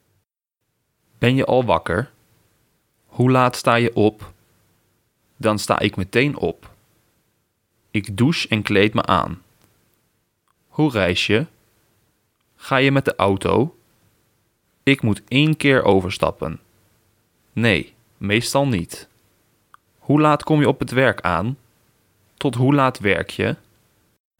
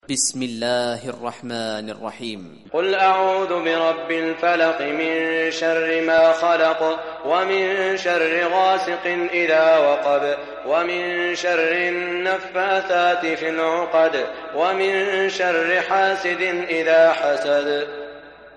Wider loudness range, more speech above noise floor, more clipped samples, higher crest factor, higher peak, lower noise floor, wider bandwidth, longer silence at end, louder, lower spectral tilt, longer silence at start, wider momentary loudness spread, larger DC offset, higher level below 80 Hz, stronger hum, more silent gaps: about the same, 4 LU vs 3 LU; first, 59 dB vs 20 dB; neither; about the same, 20 dB vs 16 dB; first, 0 dBFS vs -4 dBFS; first, -77 dBFS vs -40 dBFS; first, 17.5 kHz vs 11.5 kHz; first, 0.85 s vs 0.05 s; about the same, -19 LUFS vs -19 LUFS; first, -6 dB/octave vs -3 dB/octave; first, 1.2 s vs 0.1 s; first, 15 LU vs 11 LU; neither; first, -50 dBFS vs -64 dBFS; neither; neither